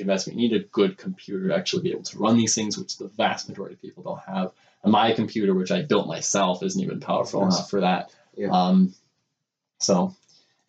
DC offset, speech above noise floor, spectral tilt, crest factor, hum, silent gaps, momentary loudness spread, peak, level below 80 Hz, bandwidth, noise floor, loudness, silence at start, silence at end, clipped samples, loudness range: under 0.1%; 58 dB; -4.5 dB/octave; 16 dB; none; none; 13 LU; -8 dBFS; -72 dBFS; 8.8 kHz; -81 dBFS; -24 LUFS; 0 s; 0.55 s; under 0.1%; 2 LU